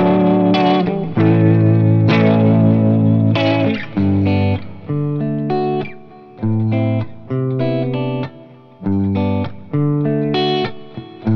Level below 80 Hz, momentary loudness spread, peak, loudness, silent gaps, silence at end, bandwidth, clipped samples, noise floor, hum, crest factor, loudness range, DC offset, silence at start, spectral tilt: -50 dBFS; 12 LU; 0 dBFS; -16 LUFS; none; 0 s; 5.8 kHz; under 0.1%; -40 dBFS; none; 14 dB; 7 LU; under 0.1%; 0 s; -9.5 dB/octave